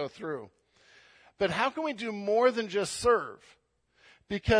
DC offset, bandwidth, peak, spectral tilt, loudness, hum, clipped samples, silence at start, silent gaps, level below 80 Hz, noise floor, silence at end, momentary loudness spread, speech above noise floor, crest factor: under 0.1%; 10.5 kHz; -12 dBFS; -4.5 dB/octave; -30 LUFS; none; under 0.1%; 0 s; none; -52 dBFS; -65 dBFS; 0 s; 13 LU; 36 dB; 18 dB